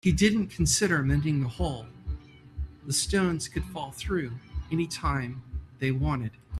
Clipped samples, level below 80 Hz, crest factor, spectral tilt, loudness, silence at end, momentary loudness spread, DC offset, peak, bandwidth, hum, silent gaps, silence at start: under 0.1%; -40 dBFS; 20 dB; -4.5 dB/octave; -28 LUFS; 0 s; 16 LU; under 0.1%; -8 dBFS; 14 kHz; none; none; 0.05 s